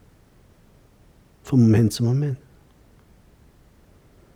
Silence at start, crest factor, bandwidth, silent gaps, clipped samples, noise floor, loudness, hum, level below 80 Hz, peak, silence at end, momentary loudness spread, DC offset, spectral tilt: 1.45 s; 18 dB; 14.5 kHz; none; under 0.1%; -54 dBFS; -20 LUFS; none; -54 dBFS; -6 dBFS; 2 s; 11 LU; under 0.1%; -7.5 dB/octave